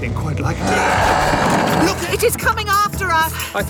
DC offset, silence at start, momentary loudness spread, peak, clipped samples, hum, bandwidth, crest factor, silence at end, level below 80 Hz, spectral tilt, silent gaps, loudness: under 0.1%; 0 s; 5 LU; -4 dBFS; under 0.1%; none; over 20 kHz; 14 dB; 0 s; -32 dBFS; -4 dB/octave; none; -16 LUFS